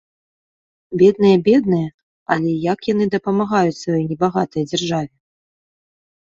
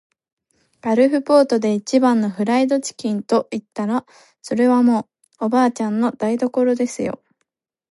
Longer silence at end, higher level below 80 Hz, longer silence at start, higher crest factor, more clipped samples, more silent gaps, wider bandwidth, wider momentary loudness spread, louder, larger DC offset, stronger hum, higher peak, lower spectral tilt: first, 1.3 s vs 0.75 s; first, -56 dBFS vs -66 dBFS; about the same, 0.9 s vs 0.85 s; about the same, 16 dB vs 16 dB; neither; first, 1.94-2.26 s vs none; second, 7.8 kHz vs 11.5 kHz; about the same, 10 LU vs 11 LU; about the same, -18 LUFS vs -19 LUFS; neither; neither; about the same, -2 dBFS vs -4 dBFS; about the same, -6.5 dB/octave vs -5.5 dB/octave